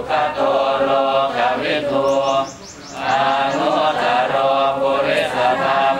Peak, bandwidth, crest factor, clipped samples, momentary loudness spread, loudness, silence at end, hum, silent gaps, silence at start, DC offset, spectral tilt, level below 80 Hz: -4 dBFS; 12.5 kHz; 14 dB; under 0.1%; 4 LU; -17 LUFS; 0 s; none; none; 0 s; under 0.1%; -4 dB/octave; -54 dBFS